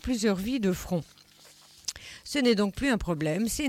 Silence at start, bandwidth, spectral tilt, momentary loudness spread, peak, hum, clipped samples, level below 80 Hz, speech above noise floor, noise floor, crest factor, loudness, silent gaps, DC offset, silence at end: 0.05 s; 17 kHz; -4.5 dB/octave; 12 LU; -14 dBFS; none; under 0.1%; -46 dBFS; 28 dB; -55 dBFS; 16 dB; -28 LUFS; none; under 0.1%; 0 s